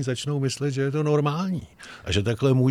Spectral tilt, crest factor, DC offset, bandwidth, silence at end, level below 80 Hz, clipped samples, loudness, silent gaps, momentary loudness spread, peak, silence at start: -6 dB/octave; 14 dB; under 0.1%; 13 kHz; 0 s; -48 dBFS; under 0.1%; -25 LUFS; none; 10 LU; -10 dBFS; 0 s